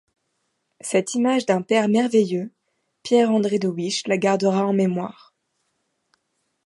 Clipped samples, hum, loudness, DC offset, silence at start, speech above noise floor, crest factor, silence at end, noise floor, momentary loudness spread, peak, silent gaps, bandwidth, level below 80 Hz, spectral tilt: under 0.1%; none; -21 LUFS; under 0.1%; 0.85 s; 53 dB; 18 dB; 1.55 s; -73 dBFS; 11 LU; -4 dBFS; none; 11.5 kHz; -72 dBFS; -5.5 dB/octave